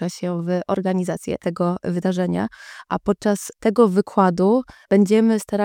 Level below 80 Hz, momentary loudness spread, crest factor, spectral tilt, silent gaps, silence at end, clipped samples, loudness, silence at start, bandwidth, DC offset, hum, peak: -54 dBFS; 9 LU; 18 dB; -7 dB/octave; none; 0 s; under 0.1%; -20 LUFS; 0 s; 16.5 kHz; under 0.1%; none; -2 dBFS